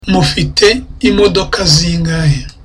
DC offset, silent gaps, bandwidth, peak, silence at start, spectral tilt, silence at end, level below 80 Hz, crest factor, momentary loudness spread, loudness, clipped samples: under 0.1%; none; 15 kHz; 0 dBFS; 0.05 s; -4.5 dB/octave; 0.15 s; -26 dBFS; 12 dB; 5 LU; -11 LUFS; under 0.1%